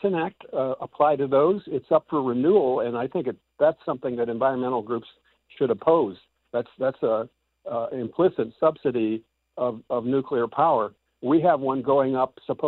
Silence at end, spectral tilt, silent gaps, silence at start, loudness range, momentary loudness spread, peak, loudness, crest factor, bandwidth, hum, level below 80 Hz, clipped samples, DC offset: 0 s; -10.5 dB/octave; none; 0.05 s; 3 LU; 10 LU; -8 dBFS; -24 LUFS; 16 dB; 4.3 kHz; none; -66 dBFS; under 0.1%; under 0.1%